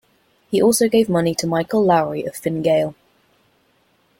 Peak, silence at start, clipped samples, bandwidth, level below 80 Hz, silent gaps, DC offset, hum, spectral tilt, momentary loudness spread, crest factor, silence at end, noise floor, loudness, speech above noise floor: -4 dBFS; 0.5 s; under 0.1%; 17 kHz; -58 dBFS; none; under 0.1%; none; -5 dB/octave; 9 LU; 16 dB; 1.25 s; -61 dBFS; -18 LUFS; 43 dB